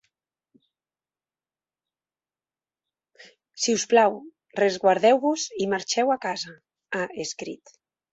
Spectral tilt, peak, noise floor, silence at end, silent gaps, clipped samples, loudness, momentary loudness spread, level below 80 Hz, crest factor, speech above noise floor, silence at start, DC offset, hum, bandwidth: -3 dB/octave; -4 dBFS; under -90 dBFS; 0.6 s; none; under 0.1%; -23 LUFS; 17 LU; -74 dBFS; 22 dB; over 67 dB; 3.55 s; under 0.1%; none; 8.2 kHz